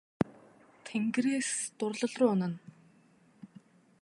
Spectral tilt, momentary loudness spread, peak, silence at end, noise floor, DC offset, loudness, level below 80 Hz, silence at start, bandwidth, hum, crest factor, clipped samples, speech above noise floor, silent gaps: -5 dB/octave; 10 LU; -12 dBFS; 0.55 s; -64 dBFS; under 0.1%; -32 LUFS; -70 dBFS; 0.2 s; 11.5 kHz; none; 24 dB; under 0.1%; 33 dB; none